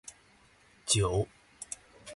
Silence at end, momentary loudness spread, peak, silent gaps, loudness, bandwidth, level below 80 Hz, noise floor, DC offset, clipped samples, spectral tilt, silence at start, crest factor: 0 s; 20 LU; -12 dBFS; none; -32 LUFS; 12 kHz; -50 dBFS; -62 dBFS; under 0.1%; under 0.1%; -3.5 dB/octave; 0.05 s; 22 dB